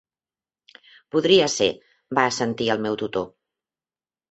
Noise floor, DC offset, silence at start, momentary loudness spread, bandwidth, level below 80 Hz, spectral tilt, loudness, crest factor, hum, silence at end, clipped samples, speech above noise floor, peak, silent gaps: under -90 dBFS; under 0.1%; 1.15 s; 12 LU; 8.2 kHz; -62 dBFS; -3.5 dB/octave; -22 LUFS; 22 dB; none; 1.05 s; under 0.1%; over 69 dB; -2 dBFS; none